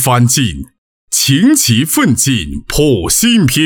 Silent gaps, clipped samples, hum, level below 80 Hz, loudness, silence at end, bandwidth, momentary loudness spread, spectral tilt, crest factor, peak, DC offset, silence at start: 0.78-1.07 s; under 0.1%; none; -32 dBFS; -11 LUFS; 0 s; over 20 kHz; 8 LU; -4 dB/octave; 10 dB; 0 dBFS; under 0.1%; 0 s